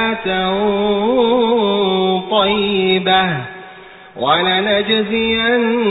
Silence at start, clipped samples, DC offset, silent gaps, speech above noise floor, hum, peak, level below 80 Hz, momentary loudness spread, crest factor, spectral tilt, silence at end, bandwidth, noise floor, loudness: 0 s; under 0.1%; under 0.1%; none; 23 dB; none; -2 dBFS; -46 dBFS; 4 LU; 14 dB; -10.5 dB/octave; 0 s; 4 kHz; -38 dBFS; -15 LUFS